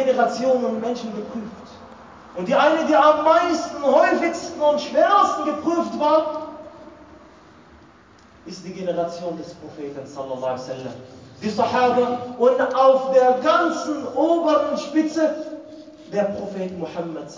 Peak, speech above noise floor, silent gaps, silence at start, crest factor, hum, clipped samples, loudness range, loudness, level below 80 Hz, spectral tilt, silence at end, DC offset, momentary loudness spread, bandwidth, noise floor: -4 dBFS; 30 dB; none; 0 s; 18 dB; none; under 0.1%; 12 LU; -20 LUFS; -60 dBFS; -5 dB/octave; 0 s; under 0.1%; 18 LU; 7.6 kHz; -50 dBFS